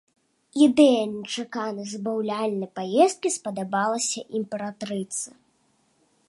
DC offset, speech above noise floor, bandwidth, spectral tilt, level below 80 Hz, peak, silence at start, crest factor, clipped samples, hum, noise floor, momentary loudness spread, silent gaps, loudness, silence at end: under 0.1%; 43 dB; 11.5 kHz; -4 dB/octave; -74 dBFS; -6 dBFS; 0.55 s; 20 dB; under 0.1%; none; -66 dBFS; 13 LU; none; -24 LUFS; 1 s